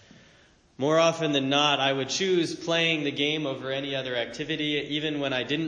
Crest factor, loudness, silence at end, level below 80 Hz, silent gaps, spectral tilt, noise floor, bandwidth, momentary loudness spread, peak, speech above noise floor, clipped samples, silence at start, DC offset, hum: 18 dB; -26 LUFS; 0 s; -64 dBFS; none; -4 dB/octave; -58 dBFS; 10 kHz; 8 LU; -8 dBFS; 32 dB; under 0.1%; 0.8 s; under 0.1%; none